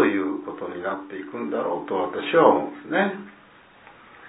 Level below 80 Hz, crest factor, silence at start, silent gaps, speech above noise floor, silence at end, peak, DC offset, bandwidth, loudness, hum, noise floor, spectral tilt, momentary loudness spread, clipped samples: -70 dBFS; 22 dB; 0 s; none; 27 dB; 0 s; -2 dBFS; under 0.1%; 4 kHz; -24 LUFS; none; -50 dBFS; -9.5 dB/octave; 15 LU; under 0.1%